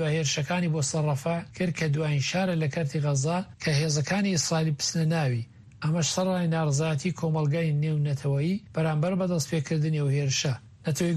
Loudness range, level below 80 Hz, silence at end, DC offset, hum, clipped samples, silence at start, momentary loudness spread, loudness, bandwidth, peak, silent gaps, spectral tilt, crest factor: 1 LU; -60 dBFS; 0 s; under 0.1%; none; under 0.1%; 0 s; 4 LU; -27 LUFS; 13 kHz; -14 dBFS; none; -5 dB/octave; 12 dB